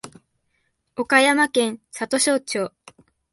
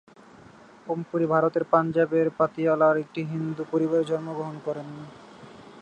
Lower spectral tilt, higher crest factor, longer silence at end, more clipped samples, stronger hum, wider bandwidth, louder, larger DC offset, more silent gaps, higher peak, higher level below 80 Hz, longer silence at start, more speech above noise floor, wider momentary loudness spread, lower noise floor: second, -2 dB/octave vs -8.5 dB/octave; about the same, 20 dB vs 20 dB; first, 0.65 s vs 0 s; neither; neither; first, 12 kHz vs 9 kHz; first, -20 LUFS vs -25 LUFS; neither; neither; about the same, -4 dBFS vs -6 dBFS; about the same, -68 dBFS vs -68 dBFS; second, 0.05 s vs 0.85 s; first, 50 dB vs 26 dB; about the same, 15 LU vs 13 LU; first, -71 dBFS vs -50 dBFS